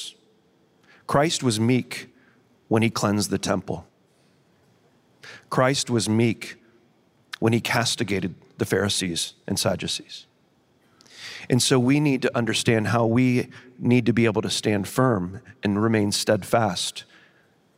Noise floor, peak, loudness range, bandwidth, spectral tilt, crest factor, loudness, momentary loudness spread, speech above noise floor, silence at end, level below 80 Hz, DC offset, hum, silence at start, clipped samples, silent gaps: -63 dBFS; -6 dBFS; 5 LU; 16 kHz; -4.5 dB/octave; 18 dB; -23 LUFS; 15 LU; 40 dB; 0.75 s; -60 dBFS; under 0.1%; none; 0 s; under 0.1%; none